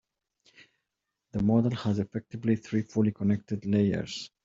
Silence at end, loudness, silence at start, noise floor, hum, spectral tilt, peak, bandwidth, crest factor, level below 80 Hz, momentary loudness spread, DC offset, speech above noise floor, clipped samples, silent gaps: 0.2 s; -29 LUFS; 1.35 s; -85 dBFS; none; -7.5 dB/octave; -12 dBFS; 7.6 kHz; 18 dB; -58 dBFS; 8 LU; under 0.1%; 57 dB; under 0.1%; none